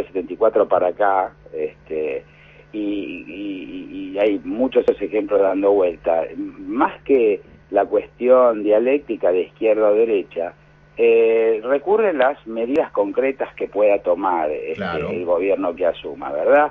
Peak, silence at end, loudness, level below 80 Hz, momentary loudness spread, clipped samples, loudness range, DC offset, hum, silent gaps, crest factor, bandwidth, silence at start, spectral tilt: -2 dBFS; 0 s; -19 LUFS; -54 dBFS; 12 LU; under 0.1%; 5 LU; under 0.1%; none; none; 16 dB; 4.7 kHz; 0 s; -8 dB/octave